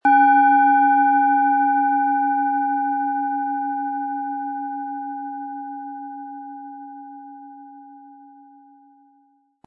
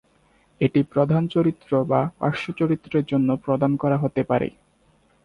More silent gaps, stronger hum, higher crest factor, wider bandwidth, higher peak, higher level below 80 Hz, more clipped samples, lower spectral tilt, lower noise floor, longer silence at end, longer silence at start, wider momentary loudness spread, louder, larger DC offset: neither; neither; about the same, 16 dB vs 18 dB; second, 3.5 kHz vs 10.5 kHz; about the same, -6 dBFS vs -6 dBFS; second, -78 dBFS vs -56 dBFS; neither; second, -6.5 dB/octave vs -9.5 dB/octave; about the same, -61 dBFS vs -61 dBFS; first, 1.5 s vs 0.75 s; second, 0.05 s vs 0.6 s; first, 23 LU vs 4 LU; first, -19 LUFS vs -22 LUFS; neither